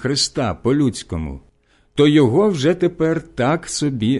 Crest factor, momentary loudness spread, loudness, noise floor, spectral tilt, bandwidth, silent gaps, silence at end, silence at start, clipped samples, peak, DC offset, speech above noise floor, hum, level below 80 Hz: 14 dB; 14 LU; -18 LUFS; -56 dBFS; -5.5 dB/octave; 11.5 kHz; none; 0 s; 0 s; under 0.1%; -4 dBFS; under 0.1%; 39 dB; none; -40 dBFS